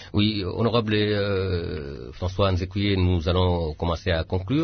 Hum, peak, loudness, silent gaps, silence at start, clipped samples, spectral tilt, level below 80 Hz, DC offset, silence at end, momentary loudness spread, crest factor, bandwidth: none; -8 dBFS; -24 LUFS; none; 0 s; under 0.1%; -7.5 dB/octave; -42 dBFS; under 0.1%; 0 s; 8 LU; 14 dB; 6.4 kHz